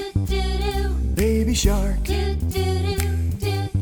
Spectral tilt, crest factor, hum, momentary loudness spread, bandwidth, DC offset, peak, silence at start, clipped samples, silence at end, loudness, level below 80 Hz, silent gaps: -5.5 dB/octave; 16 dB; none; 4 LU; over 20 kHz; under 0.1%; -4 dBFS; 0 s; under 0.1%; 0 s; -23 LUFS; -24 dBFS; none